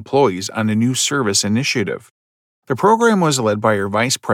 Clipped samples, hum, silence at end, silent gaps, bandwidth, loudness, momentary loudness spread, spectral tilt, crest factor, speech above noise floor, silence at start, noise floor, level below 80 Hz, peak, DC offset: under 0.1%; none; 0 s; 2.11-2.62 s; 17 kHz; -17 LUFS; 7 LU; -4 dB/octave; 16 dB; over 73 dB; 0 s; under -90 dBFS; -66 dBFS; -2 dBFS; under 0.1%